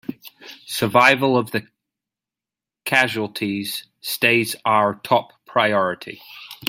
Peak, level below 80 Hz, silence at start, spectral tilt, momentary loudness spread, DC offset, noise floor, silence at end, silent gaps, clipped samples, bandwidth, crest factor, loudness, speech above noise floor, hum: 0 dBFS; -66 dBFS; 0.1 s; -4 dB/octave; 21 LU; under 0.1%; -89 dBFS; 0 s; none; under 0.1%; 16.5 kHz; 22 dB; -19 LUFS; 69 dB; none